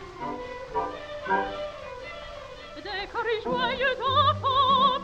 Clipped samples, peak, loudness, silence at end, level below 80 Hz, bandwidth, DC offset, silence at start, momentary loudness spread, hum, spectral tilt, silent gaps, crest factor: under 0.1%; -10 dBFS; -26 LUFS; 0 s; -52 dBFS; 8.6 kHz; under 0.1%; 0 s; 17 LU; none; -5 dB/octave; none; 18 dB